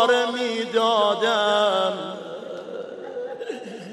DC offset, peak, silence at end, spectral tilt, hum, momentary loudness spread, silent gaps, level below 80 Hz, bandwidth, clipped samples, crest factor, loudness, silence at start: under 0.1%; -4 dBFS; 0 s; -3 dB/octave; none; 15 LU; none; -78 dBFS; 12.5 kHz; under 0.1%; 18 dB; -22 LUFS; 0 s